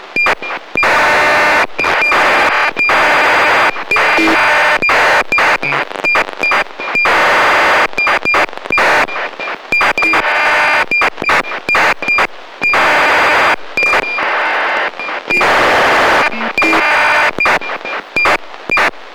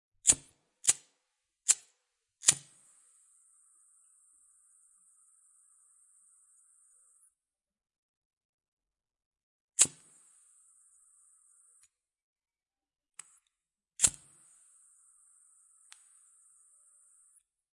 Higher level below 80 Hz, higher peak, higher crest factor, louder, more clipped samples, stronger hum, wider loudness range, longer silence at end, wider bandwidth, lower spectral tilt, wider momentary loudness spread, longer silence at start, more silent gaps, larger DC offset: first, -42 dBFS vs -70 dBFS; about the same, -6 dBFS vs -4 dBFS; second, 6 dB vs 34 dB; first, -11 LUFS vs -28 LUFS; neither; neither; second, 2 LU vs 5 LU; second, 0 s vs 3.65 s; first, over 20 kHz vs 11.5 kHz; first, -2.5 dB/octave vs 1 dB/octave; second, 6 LU vs 26 LU; second, 0 s vs 0.25 s; second, none vs 7.98-8.30 s, 8.37-8.58 s, 8.68-8.77 s, 9.26-9.31 s, 9.43-9.68 s, 12.22-12.34 s; neither